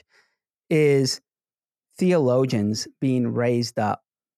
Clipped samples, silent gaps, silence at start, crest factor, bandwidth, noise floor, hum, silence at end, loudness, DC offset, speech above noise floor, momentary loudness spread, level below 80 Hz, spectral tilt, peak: under 0.1%; none; 0.7 s; 14 dB; 15 kHz; under -90 dBFS; none; 0.4 s; -22 LUFS; under 0.1%; over 69 dB; 7 LU; -70 dBFS; -6 dB/octave; -8 dBFS